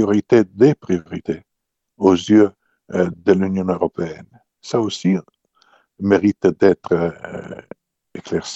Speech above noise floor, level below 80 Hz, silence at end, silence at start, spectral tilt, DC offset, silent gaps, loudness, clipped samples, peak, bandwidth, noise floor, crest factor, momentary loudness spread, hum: 60 dB; -56 dBFS; 0 s; 0 s; -7 dB/octave; under 0.1%; none; -18 LUFS; under 0.1%; 0 dBFS; 8.2 kHz; -77 dBFS; 18 dB; 18 LU; none